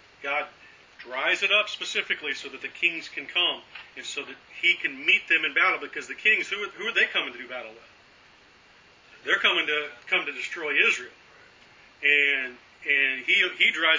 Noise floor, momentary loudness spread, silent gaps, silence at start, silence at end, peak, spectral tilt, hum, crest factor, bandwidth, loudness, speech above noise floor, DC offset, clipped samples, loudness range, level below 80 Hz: -55 dBFS; 16 LU; none; 0.2 s; 0 s; -6 dBFS; -1 dB/octave; none; 20 dB; 7.6 kHz; -24 LUFS; 29 dB; under 0.1%; under 0.1%; 4 LU; -72 dBFS